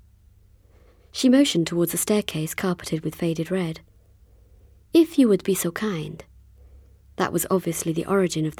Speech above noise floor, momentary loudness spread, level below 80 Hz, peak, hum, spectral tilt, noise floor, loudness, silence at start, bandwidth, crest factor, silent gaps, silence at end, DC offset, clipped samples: 32 dB; 13 LU; -54 dBFS; -6 dBFS; none; -5 dB/octave; -54 dBFS; -23 LUFS; 1.15 s; 18 kHz; 18 dB; none; 0.05 s; under 0.1%; under 0.1%